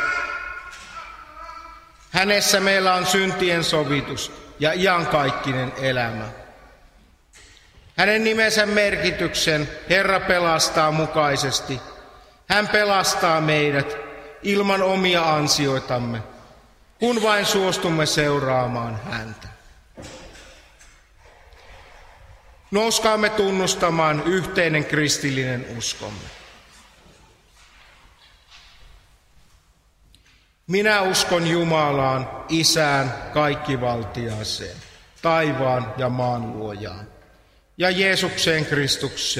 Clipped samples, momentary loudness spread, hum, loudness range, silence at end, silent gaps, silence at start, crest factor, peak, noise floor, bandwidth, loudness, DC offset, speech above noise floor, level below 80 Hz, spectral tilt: under 0.1%; 16 LU; none; 6 LU; 0 s; none; 0 s; 22 dB; 0 dBFS; -57 dBFS; 16 kHz; -20 LUFS; under 0.1%; 37 dB; -50 dBFS; -3.5 dB/octave